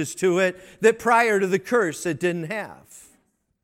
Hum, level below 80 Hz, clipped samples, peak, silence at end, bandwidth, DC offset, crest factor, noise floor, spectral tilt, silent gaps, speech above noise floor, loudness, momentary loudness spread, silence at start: none; -64 dBFS; under 0.1%; -6 dBFS; 0.65 s; 16 kHz; under 0.1%; 18 dB; -66 dBFS; -4.5 dB/octave; none; 44 dB; -22 LUFS; 11 LU; 0 s